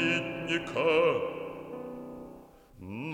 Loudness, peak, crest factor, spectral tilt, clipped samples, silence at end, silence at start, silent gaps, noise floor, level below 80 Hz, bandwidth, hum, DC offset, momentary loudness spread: -30 LUFS; -14 dBFS; 18 dB; -5.5 dB/octave; under 0.1%; 0 s; 0 s; none; -52 dBFS; -62 dBFS; 10.5 kHz; none; under 0.1%; 20 LU